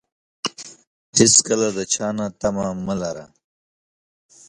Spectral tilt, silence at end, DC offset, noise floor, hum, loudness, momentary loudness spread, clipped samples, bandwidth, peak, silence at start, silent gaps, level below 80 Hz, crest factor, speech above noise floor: -3 dB/octave; 1.25 s; under 0.1%; under -90 dBFS; none; -19 LUFS; 18 LU; under 0.1%; 11.5 kHz; 0 dBFS; 0.45 s; 0.87-1.13 s; -54 dBFS; 22 dB; over 70 dB